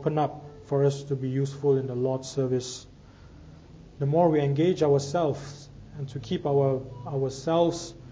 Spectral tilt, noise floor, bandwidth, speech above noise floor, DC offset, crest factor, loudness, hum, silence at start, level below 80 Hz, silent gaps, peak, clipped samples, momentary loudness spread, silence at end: -7 dB/octave; -49 dBFS; 8 kHz; 23 dB; under 0.1%; 18 dB; -27 LUFS; none; 0 s; -56 dBFS; none; -10 dBFS; under 0.1%; 14 LU; 0 s